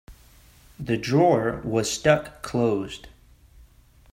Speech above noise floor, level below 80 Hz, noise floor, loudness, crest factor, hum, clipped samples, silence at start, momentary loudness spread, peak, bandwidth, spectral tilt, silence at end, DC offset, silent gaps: 31 dB; -50 dBFS; -54 dBFS; -23 LUFS; 20 dB; none; under 0.1%; 0.1 s; 14 LU; -4 dBFS; 16 kHz; -5.5 dB/octave; 1.05 s; under 0.1%; none